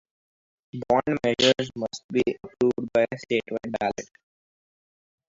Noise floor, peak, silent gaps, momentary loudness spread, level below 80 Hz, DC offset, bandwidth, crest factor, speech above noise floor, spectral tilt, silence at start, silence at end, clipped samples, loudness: under -90 dBFS; -6 dBFS; 2.04-2.09 s; 14 LU; -60 dBFS; under 0.1%; 7.8 kHz; 20 dB; over 65 dB; -4.5 dB/octave; 0.75 s; 1.25 s; under 0.1%; -25 LUFS